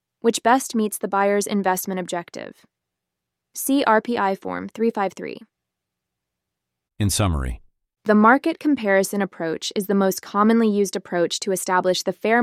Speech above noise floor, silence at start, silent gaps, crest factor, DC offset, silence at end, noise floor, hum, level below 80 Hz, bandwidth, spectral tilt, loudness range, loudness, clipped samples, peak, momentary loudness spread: 62 dB; 0.25 s; none; 20 dB; under 0.1%; 0 s; -83 dBFS; none; -42 dBFS; 16 kHz; -4.5 dB/octave; 7 LU; -21 LUFS; under 0.1%; -2 dBFS; 13 LU